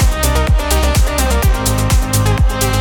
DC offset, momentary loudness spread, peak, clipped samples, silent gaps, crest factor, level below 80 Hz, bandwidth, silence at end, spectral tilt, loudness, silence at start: under 0.1%; 1 LU; 0 dBFS; under 0.1%; none; 12 dB; -14 dBFS; 19 kHz; 0 s; -4.5 dB/octave; -14 LUFS; 0 s